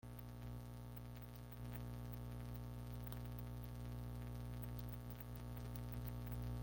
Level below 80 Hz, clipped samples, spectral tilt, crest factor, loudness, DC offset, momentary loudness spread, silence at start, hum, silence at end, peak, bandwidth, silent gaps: -54 dBFS; under 0.1%; -7 dB/octave; 16 dB; -51 LUFS; under 0.1%; 5 LU; 0.05 s; 60 Hz at -50 dBFS; 0 s; -34 dBFS; 17 kHz; none